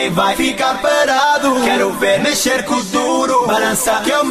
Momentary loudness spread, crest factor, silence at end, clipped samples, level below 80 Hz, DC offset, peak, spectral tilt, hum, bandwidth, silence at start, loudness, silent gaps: 3 LU; 12 dB; 0 s; under 0.1%; -46 dBFS; under 0.1%; -2 dBFS; -2.5 dB/octave; none; 15 kHz; 0 s; -14 LUFS; none